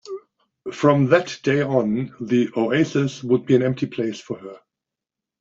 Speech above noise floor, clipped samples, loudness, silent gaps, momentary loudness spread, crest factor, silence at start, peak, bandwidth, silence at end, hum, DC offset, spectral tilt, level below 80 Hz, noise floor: 66 dB; under 0.1%; -20 LUFS; none; 17 LU; 18 dB; 0.05 s; -2 dBFS; 7.8 kHz; 0.85 s; none; under 0.1%; -7 dB/octave; -62 dBFS; -86 dBFS